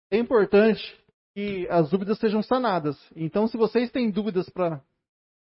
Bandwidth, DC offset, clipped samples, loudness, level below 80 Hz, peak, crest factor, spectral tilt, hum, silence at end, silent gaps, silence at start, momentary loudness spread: 5.8 kHz; under 0.1%; under 0.1%; -24 LUFS; -60 dBFS; -8 dBFS; 16 dB; -11 dB/octave; none; 0.7 s; 1.14-1.34 s; 0.1 s; 13 LU